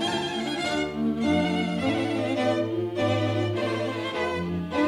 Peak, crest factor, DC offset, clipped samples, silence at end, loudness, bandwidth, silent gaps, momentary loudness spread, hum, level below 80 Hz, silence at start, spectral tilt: -12 dBFS; 14 dB; under 0.1%; under 0.1%; 0 s; -26 LUFS; 14 kHz; none; 4 LU; none; -54 dBFS; 0 s; -6 dB/octave